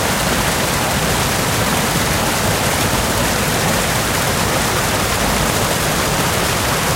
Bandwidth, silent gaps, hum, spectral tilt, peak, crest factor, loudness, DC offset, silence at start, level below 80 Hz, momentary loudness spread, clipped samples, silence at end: 16 kHz; none; none; -3 dB/octave; -2 dBFS; 14 dB; -16 LUFS; under 0.1%; 0 s; -30 dBFS; 1 LU; under 0.1%; 0 s